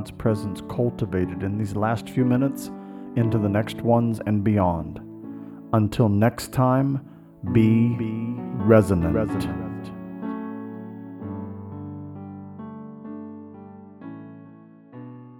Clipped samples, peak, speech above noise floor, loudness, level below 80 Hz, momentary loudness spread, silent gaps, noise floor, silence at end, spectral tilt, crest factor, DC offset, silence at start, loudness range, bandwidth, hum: under 0.1%; -4 dBFS; 25 dB; -23 LUFS; -48 dBFS; 19 LU; none; -47 dBFS; 0 s; -8 dB/octave; 20 dB; under 0.1%; 0 s; 16 LU; 16 kHz; none